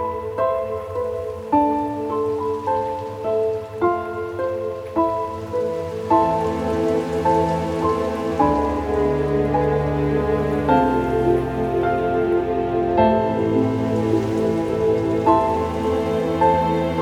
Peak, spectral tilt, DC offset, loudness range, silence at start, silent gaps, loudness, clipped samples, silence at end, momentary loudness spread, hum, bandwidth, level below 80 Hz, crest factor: -2 dBFS; -8 dB/octave; under 0.1%; 4 LU; 0 s; none; -21 LUFS; under 0.1%; 0 s; 7 LU; none; 15 kHz; -40 dBFS; 18 dB